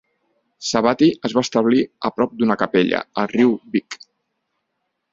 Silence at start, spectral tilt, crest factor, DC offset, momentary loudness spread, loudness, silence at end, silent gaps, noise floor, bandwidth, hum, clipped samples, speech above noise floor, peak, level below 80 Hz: 0.6 s; -5 dB/octave; 20 dB; under 0.1%; 8 LU; -19 LUFS; 1.2 s; none; -75 dBFS; 7.8 kHz; none; under 0.1%; 57 dB; 0 dBFS; -60 dBFS